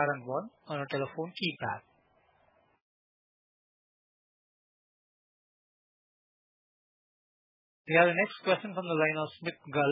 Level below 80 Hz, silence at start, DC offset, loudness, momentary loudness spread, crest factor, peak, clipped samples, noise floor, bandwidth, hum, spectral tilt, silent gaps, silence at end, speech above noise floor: -86 dBFS; 0 s; under 0.1%; -31 LUFS; 13 LU; 26 dB; -8 dBFS; under 0.1%; -69 dBFS; 4.8 kHz; none; -3.5 dB/octave; 2.82-7.85 s; 0 s; 38 dB